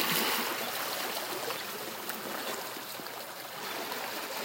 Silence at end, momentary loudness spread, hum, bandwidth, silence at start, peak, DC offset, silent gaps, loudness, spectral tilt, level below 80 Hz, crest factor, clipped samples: 0 s; 10 LU; none; 16.5 kHz; 0 s; -14 dBFS; under 0.1%; none; -34 LUFS; -1.5 dB/octave; -82 dBFS; 22 dB; under 0.1%